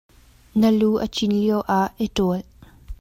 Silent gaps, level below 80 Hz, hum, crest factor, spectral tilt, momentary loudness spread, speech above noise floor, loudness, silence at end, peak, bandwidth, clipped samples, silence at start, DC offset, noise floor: none; -44 dBFS; none; 14 dB; -6.5 dB/octave; 6 LU; 19 dB; -21 LUFS; 0.05 s; -8 dBFS; 16 kHz; under 0.1%; 0.55 s; under 0.1%; -39 dBFS